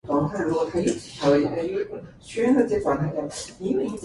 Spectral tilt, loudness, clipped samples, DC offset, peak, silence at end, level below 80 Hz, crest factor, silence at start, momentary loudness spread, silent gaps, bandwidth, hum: -6 dB/octave; -24 LUFS; under 0.1%; under 0.1%; -8 dBFS; 0 s; -52 dBFS; 16 dB; 0.05 s; 11 LU; none; 11.5 kHz; none